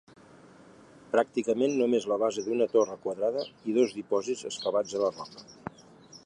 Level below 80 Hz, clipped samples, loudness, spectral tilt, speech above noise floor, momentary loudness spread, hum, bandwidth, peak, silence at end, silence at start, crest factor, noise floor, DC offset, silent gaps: -74 dBFS; under 0.1%; -29 LUFS; -4.5 dB/octave; 26 dB; 17 LU; none; 10.5 kHz; -10 dBFS; 0.1 s; 1.15 s; 18 dB; -54 dBFS; under 0.1%; none